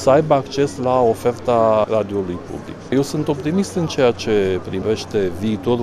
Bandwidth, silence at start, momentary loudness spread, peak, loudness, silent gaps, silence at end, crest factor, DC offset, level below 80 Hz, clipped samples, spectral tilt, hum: 15 kHz; 0 s; 7 LU; -2 dBFS; -19 LUFS; none; 0 s; 16 dB; under 0.1%; -48 dBFS; under 0.1%; -6 dB/octave; none